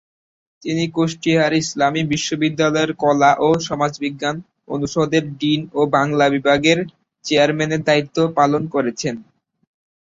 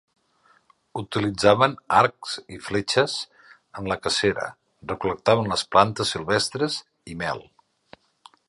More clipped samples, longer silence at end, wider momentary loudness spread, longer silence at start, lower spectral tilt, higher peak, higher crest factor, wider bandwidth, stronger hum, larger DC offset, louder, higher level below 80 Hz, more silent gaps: neither; second, 0.9 s vs 1.1 s; second, 10 LU vs 16 LU; second, 0.65 s vs 0.95 s; about the same, -5 dB/octave vs -4 dB/octave; about the same, -2 dBFS vs -2 dBFS; second, 16 dB vs 22 dB; second, 8 kHz vs 11.5 kHz; neither; neither; first, -18 LUFS vs -23 LUFS; about the same, -56 dBFS vs -54 dBFS; neither